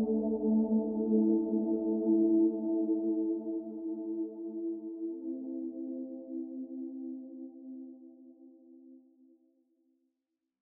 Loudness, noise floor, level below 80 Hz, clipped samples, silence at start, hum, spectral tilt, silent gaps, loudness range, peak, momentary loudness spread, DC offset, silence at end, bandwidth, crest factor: -33 LUFS; -87 dBFS; -72 dBFS; under 0.1%; 0 s; none; -14.5 dB/octave; none; 19 LU; -16 dBFS; 17 LU; under 0.1%; 1.65 s; 1.2 kHz; 16 dB